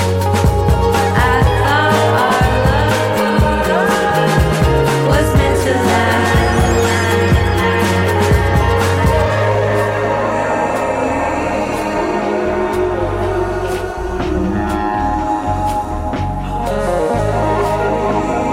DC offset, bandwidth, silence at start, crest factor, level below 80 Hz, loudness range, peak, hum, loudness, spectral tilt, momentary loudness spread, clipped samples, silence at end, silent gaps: under 0.1%; 16.5 kHz; 0 s; 14 dB; -24 dBFS; 5 LU; 0 dBFS; none; -15 LUFS; -6 dB/octave; 5 LU; under 0.1%; 0 s; none